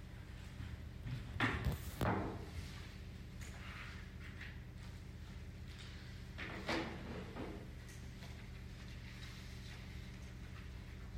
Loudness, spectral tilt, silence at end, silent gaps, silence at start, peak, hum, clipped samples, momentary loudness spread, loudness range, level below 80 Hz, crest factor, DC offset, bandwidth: -47 LUFS; -5.5 dB/octave; 0 s; none; 0 s; -24 dBFS; none; under 0.1%; 13 LU; 8 LU; -54 dBFS; 22 dB; under 0.1%; 16 kHz